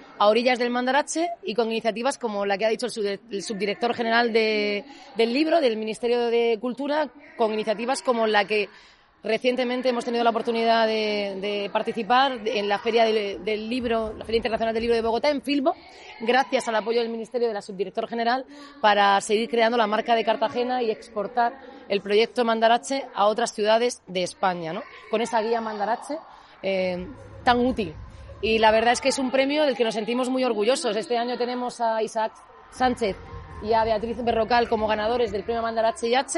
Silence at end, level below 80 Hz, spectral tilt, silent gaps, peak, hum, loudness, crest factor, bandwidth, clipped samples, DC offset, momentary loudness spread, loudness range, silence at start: 0 s; -54 dBFS; -3.5 dB/octave; none; -6 dBFS; none; -24 LUFS; 18 dB; 11.5 kHz; under 0.1%; under 0.1%; 8 LU; 3 LU; 0 s